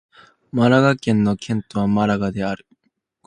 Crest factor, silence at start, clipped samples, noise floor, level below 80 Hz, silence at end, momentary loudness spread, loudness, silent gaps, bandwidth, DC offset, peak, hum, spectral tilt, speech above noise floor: 20 dB; 0.55 s; under 0.1%; -70 dBFS; -50 dBFS; 0.7 s; 12 LU; -19 LUFS; none; 9.8 kHz; under 0.1%; 0 dBFS; none; -7 dB/octave; 52 dB